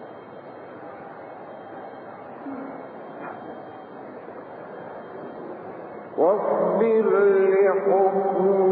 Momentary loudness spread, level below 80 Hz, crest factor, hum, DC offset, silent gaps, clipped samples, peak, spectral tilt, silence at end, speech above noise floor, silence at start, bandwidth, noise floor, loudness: 21 LU; -76 dBFS; 16 dB; none; under 0.1%; none; under 0.1%; -8 dBFS; -11.5 dB/octave; 0 s; 21 dB; 0 s; 4.1 kHz; -41 dBFS; -20 LUFS